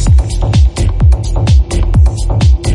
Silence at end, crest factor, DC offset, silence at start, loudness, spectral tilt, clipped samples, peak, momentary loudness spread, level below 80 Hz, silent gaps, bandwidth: 0 s; 8 dB; under 0.1%; 0 s; -11 LUFS; -6.5 dB/octave; under 0.1%; 0 dBFS; 2 LU; -10 dBFS; none; 11 kHz